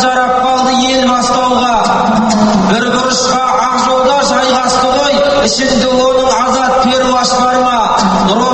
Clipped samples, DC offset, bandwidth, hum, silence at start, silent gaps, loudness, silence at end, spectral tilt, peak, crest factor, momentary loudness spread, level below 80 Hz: under 0.1%; under 0.1%; 8.8 kHz; none; 0 s; none; -10 LUFS; 0 s; -3.5 dB/octave; 0 dBFS; 10 dB; 1 LU; -36 dBFS